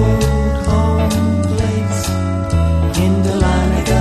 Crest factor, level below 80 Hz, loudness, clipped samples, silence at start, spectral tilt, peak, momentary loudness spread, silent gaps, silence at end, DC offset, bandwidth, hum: 12 dB; -20 dBFS; -16 LUFS; under 0.1%; 0 s; -6.5 dB/octave; -2 dBFS; 3 LU; none; 0 s; under 0.1%; 13.5 kHz; none